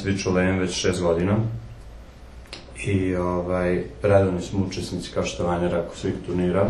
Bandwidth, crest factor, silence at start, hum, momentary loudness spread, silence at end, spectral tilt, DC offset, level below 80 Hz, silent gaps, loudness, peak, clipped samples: 11.5 kHz; 20 dB; 0 s; none; 12 LU; 0 s; -6 dB/octave; under 0.1%; -42 dBFS; none; -24 LUFS; -4 dBFS; under 0.1%